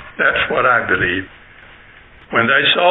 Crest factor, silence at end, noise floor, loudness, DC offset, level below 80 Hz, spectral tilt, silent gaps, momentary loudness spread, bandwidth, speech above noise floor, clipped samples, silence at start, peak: 16 dB; 0 s; -43 dBFS; -15 LUFS; under 0.1%; -46 dBFS; -8.5 dB/octave; none; 9 LU; 4.1 kHz; 28 dB; under 0.1%; 0 s; -2 dBFS